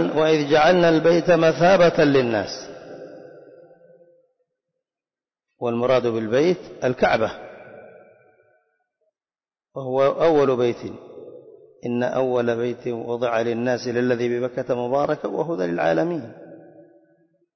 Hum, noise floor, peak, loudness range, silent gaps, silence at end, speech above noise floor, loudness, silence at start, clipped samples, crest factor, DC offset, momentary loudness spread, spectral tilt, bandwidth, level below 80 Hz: none; under -90 dBFS; -6 dBFS; 9 LU; none; 1 s; over 70 dB; -20 LUFS; 0 s; under 0.1%; 16 dB; under 0.1%; 21 LU; -6 dB/octave; 6.4 kHz; -56 dBFS